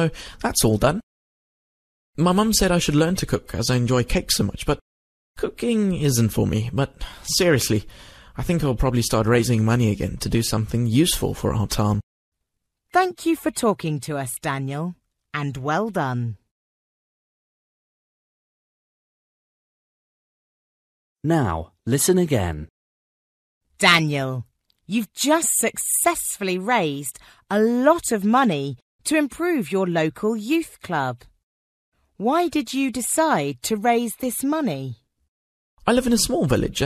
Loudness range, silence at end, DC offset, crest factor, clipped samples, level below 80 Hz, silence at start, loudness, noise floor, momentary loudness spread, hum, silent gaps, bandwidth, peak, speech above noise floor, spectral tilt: 6 LU; 0 s; under 0.1%; 22 dB; under 0.1%; -40 dBFS; 0 s; -22 LUFS; -78 dBFS; 10 LU; none; 1.03-2.13 s, 4.81-5.34 s, 12.03-12.32 s, 16.51-21.16 s, 22.70-23.61 s, 28.82-28.99 s, 31.43-31.92 s, 35.28-35.77 s; 14 kHz; 0 dBFS; 57 dB; -4.5 dB/octave